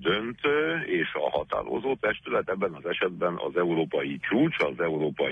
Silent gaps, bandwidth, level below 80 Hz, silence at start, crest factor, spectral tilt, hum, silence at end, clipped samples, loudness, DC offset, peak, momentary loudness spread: none; 8 kHz; -60 dBFS; 0 s; 14 dB; -7.5 dB/octave; none; 0 s; under 0.1%; -27 LUFS; under 0.1%; -12 dBFS; 5 LU